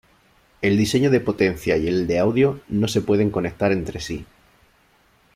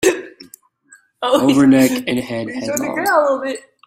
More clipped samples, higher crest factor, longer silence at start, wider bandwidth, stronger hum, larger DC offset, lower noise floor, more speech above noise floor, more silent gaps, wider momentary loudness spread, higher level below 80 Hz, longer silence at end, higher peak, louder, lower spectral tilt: neither; about the same, 16 dB vs 16 dB; first, 0.6 s vs 0 s; about the same, 15.5 kHz vs 16 kHz; neither; neither; first, -59 dBFS vs -51 dBFS; first, 39 dB vs 35 dB; neither; second, 8 LU vs 13 LU; first, -46 dBFS vs -56 dBFS; first, 1.1 s vs 0.25 s; second, -6 dBFS vs 0 dBFS; second, -21 LUFS vs -16 LUFS; first, -6 dB/octave vs -4.5 dB/octave